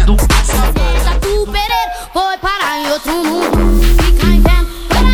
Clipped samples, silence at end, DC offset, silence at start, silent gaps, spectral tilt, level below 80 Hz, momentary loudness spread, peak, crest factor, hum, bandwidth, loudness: under 0.1%; 0 s; under 0.1%; 0 s; none; -5 dB/octave; -12 dBFS; 5 LU; 0 dBFS; 10 dB; none; 17.5 kHz; -14 LUFS